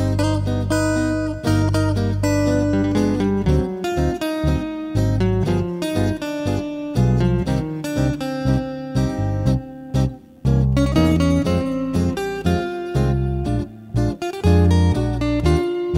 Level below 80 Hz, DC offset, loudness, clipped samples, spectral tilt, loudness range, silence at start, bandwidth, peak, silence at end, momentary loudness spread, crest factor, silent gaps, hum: -30 dBFS; under 0.1%; -20 LUFS; under 0.1%; -7 dB/octave; 2 LU; 0 s; 15.5 kHz; -4 dBFS; 0 s; 6 LU; 16 dB; none; none